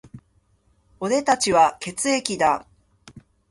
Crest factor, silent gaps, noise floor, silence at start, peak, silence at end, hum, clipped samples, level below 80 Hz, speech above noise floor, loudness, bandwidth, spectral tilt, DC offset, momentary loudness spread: 22 dB; none; -63 dBFS; 0.15 s; -2 dBFS; 0.3 s; none; under 0.1%; -58 dBFS; 42 dB; -21 LUFS; 11.5 kHz; -3 dB/octave; under 0.1%; 9 LU